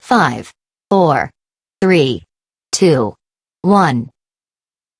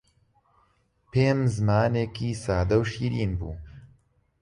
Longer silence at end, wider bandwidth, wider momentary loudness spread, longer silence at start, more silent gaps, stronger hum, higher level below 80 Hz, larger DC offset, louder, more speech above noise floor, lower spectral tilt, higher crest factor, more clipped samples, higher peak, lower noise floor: first, 0.9 s vs 0.55 s; about the same, 11 kHz vs 11 kHz; first, 12 LU vs 9 LU; second, 0.05 s vs 1.15 s; neither; neither; second, -54 dBFS vs -42 dBFS; neither; first, -15 LUFS vs -26 LUFS; first, over 77 dB vs 42 dB; second, -5.5 dB/octave vs -7 dB/octave; about the same, 16 dB vs 16 dB; neither; first, 0 dBFS vs -10 dBFS; first, under -90 dBFS vs -66 dBFS